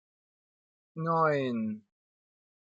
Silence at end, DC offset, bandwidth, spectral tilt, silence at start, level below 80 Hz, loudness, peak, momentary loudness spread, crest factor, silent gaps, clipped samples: 0.95 s; under 0.1%; 7.6 kHz; -8.5 dB/octave; 0.95 s; -84 dBFS; -30 LUFS; -14 dBFS; 17 LU; 20 dB; none; under 0.1%